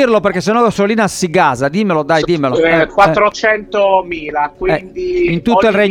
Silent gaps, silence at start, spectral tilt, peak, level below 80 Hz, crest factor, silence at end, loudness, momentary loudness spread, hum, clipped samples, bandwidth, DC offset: none; 0 s; -5.5 dB/octave; 0 dBFS; -40 dBFS; 12 dB; 0 s; -13 LUFS; 6 LU; none; under 0.1%; 16.5 kHz; under 0.1%